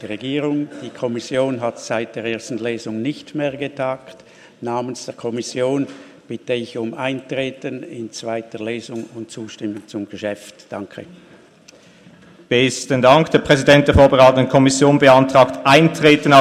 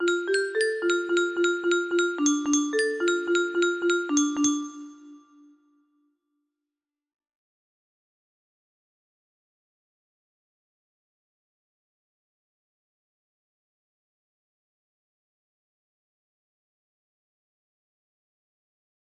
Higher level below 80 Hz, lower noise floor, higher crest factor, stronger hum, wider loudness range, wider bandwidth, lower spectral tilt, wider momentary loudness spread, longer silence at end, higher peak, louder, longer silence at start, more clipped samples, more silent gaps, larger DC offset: first, -42 dBFS vs -76 dBFS; second, -47 dBFS vs -89 dBFS; about the same, 18 dB vs 20 dB; neither; first, 16 LU vs 7 LU; first, 14 kHz vs 11.5 kHz; first, -5 dB/octave vs -1 dB/octave; first, 19 LU vs 2 LU; second, 0 s vs 13.8 s; first, 0 dBFS vs -10 dBFS; first, -17 LUFS vs -25 LUFS; about the same, 0 s vs 0 s; neither; neither; neither